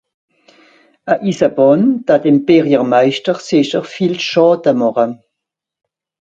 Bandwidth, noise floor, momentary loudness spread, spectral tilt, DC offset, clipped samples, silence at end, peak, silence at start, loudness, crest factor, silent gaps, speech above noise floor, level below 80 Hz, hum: 8 kHz; -80 dBFS; 8 LU; -6.5 dB/octave; under 0.1%; under 0.1%; 1.25 s; 0 dBFS; 1.05 s; -13 LUFS; 14 dB; none; 68 dB; -60 dBFS; none